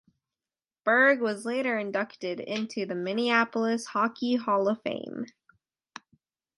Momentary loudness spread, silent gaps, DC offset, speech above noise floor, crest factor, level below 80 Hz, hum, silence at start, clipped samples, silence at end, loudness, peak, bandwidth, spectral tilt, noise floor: 13 LU; none; under 0.1%; over 63 dB; 20 dB; -80 dBFS; none; 0.85 s; under 0.1%; 1.3 s; -27 LUFS; -8 dBFS; 11.5 kHz; -4.5 dB/octave; under -90 dBFS